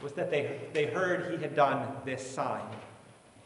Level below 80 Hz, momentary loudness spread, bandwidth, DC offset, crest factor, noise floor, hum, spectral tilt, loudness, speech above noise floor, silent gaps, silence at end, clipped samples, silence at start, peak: -74 dBFS; 12 LU; 11.5 kHz; under 0.1%; 22 dB; -56 dBFS; none; -5.5 dB/octave; -32 LUFS; 24 dB; none; 0.05 s; under 0.1%; 0 s; -12 dBFS